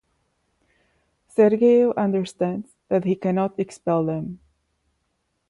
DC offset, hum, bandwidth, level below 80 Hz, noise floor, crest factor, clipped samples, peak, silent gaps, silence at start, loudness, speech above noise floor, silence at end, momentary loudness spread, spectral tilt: under 0.1%; none; 11.5 kHz; -64 dBFS; -73 dBFS; 18 dB; under 0.1%; -6 dBFS; none; 1.4 s; -22 LUFS; 53 dB; 1.15 s; 11 LU; -8 dB/octave